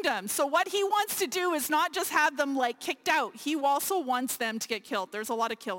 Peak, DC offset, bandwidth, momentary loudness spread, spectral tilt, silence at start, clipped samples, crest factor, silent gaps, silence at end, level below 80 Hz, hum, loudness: -12 dBFS; under 0.1%; 17 kHz; 6 LU; -1.5 dB/octave; 0 s; under 0.1%; 16 dB; none; 0 s; -74 dBFS; none; -28 LUFS